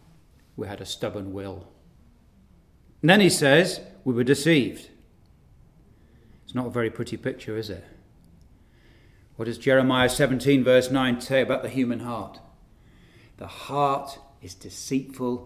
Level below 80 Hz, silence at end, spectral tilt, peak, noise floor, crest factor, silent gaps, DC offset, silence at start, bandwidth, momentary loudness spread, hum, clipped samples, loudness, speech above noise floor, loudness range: -54 dBFS; 0 s; -5 dB/octave; -4 dBFS; -56 dBFS; 22 dB; none; under 0.1%; 0.55 s; 16 kHz; 22 LU; none; under 0.1%; -23 LUFS; 32 dB; 11 LU